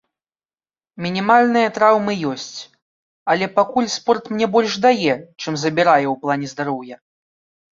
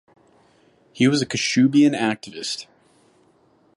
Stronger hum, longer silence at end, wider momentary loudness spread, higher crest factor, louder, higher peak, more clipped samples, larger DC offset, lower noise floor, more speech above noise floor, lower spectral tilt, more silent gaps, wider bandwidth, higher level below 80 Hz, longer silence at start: neither; second, 0.8 s vs 1.15 s; about the same, 14 LU vs 13 LU; about the same, 18 dB vs 18 dB; about the same, -18 LUFS vs -20 LUFS; first, -2 dBFS vs -6 dBFS; neither; neither; first, under -90 dBFS vs -59 dBFS; first, over 72 dB vs 39 dB; about the same, -4.5 dB/octave vs -4.5 dB/octave; first, 2.82-3.26 s vs none; second, 7.8 kHz vs 11.5 kHz; about the same, -64 dBFS vs -68 dBFS; about the same, 0.95 s vs 0.95 s